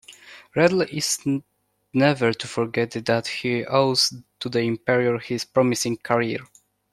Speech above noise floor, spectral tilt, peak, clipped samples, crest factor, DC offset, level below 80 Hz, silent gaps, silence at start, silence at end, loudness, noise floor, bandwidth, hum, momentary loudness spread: 24 dB; -4 dB/octave; -4 dBFS; under 0.1%; 20 dB; under 0.1%; -64 dBFS; none; 0.1 s; 0.5 s; -22 LUFS; -46 dBFS; 15 kHz; none; 9 LU